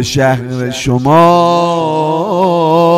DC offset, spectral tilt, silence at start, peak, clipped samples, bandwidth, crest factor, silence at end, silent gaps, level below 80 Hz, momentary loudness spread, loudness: under 0.1%; -6 dB/octave; 0 s; 0 dBFS; under 0.1%; 15.5 kHz; 10 dB; 0 s; none; -40 dBFS; 8 LU; -11 LUFS